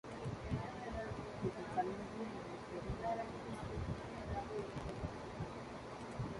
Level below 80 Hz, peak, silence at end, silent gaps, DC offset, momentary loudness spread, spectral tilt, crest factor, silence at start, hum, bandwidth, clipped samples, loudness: -56 dBFS; -26 dBFS; 0 s; none; under 0.1%; 6 LU; -6.5 dB/octave; 18 dB; 0.05 s; none; 11.5 kHz; under 0.1%; -45 LUFS